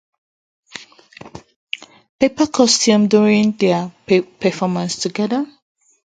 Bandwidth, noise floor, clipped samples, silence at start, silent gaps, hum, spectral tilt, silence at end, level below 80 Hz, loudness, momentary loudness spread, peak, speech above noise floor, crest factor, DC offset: 9.4 kHz; -42 dBFS; under 0.1%; 0.75 s; 1.56-1.67 s, 2.09-2.19 s; none; -4.5 dB/octave; 0.7 s; -58 dBFS; -16 LUFS; 23 LU; 0 dBFS; 26 dB; 18 dB; under 0.1%